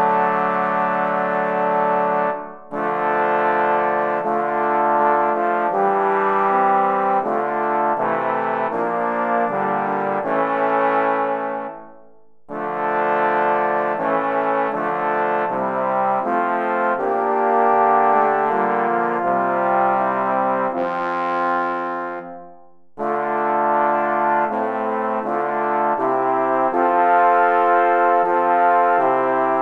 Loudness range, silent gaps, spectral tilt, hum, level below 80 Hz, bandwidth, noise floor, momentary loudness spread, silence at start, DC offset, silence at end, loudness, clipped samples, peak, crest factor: 4 LU; none; -7.5 dB/octave; none; -68 dBFS; 6.2 kHz; -53 dBFS; 6 LU; 0 s; under 0.1%; 0 s; -19 LUFS; under 0.1%; -4 dBFS; 16 dB